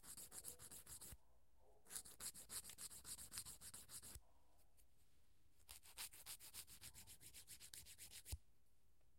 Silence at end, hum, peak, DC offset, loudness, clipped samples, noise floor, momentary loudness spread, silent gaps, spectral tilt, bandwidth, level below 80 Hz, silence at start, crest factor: 0 s; none; -32 dBFS; under 0.1%; -56 LUFS; under 0.1%; -81 dBFS; 8 LU; none; -1 dB/octave; 16.5 kHz; -72 dBFS; 0 s; 28 dB